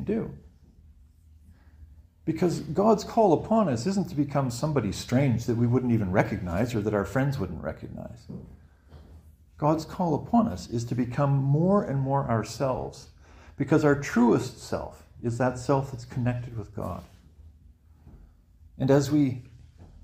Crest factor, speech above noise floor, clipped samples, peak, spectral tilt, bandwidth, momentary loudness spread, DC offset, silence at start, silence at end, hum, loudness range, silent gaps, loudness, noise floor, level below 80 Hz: 20 dB; 29 dB; under 0.1%; -8 dBFS; -7.5 dB/octave; 15.5 kHz; 14 LU; under 0.1%; 0 s; 0.2 s; none; 6 LU; none; -26 LUFS; -55 dBFS; -50 dBFS